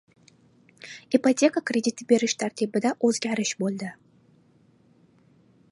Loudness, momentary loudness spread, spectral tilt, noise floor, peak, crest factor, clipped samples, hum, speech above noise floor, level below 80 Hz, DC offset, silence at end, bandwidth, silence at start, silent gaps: -25 LUFS; 15 LU; -4 dB/octave; -60 dBFS; -6 dBFS; 20 dB; under 0.1%; none; 36 dB; -76 dBFS; under 0.1%; 1.8 s; 11.5 kHz; 0.85 s; none